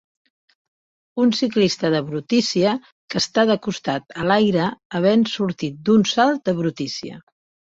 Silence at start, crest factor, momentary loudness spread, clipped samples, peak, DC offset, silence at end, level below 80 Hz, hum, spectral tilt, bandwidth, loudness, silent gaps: 1.15 s; 16 dB; 10 LU; under 0.1%; -4 dBFS; under 0.1%; 0.55 s; -60 dBFS; none; -5 dB/octave; 7.8 kHz; -20 LUFS; 2.92-3.08 s, 4.85-4.90 s